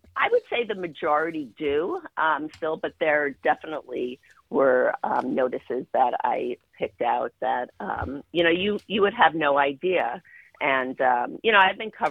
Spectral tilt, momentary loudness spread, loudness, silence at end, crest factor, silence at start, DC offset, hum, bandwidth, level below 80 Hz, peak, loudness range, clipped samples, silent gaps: -6.5 dB/octave; 11 LU; -24 LUFS; 0 s; 22 dB; 0.15 s; under 0.1%; none; 6.4 kHz; -60 dBFS; -2 dBFS; 4 LU; under 0.1%; none